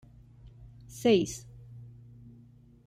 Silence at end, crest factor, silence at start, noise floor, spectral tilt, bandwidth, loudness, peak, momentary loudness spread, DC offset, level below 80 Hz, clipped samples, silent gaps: 1 s; 22 dB; 0.45 s; -56 dBFS; -5 dB/octave; 16 kHz; -27 LUFS; -12 dBFS; 27 LU; under 0.1%; -58 dBFS; under 0.1%; none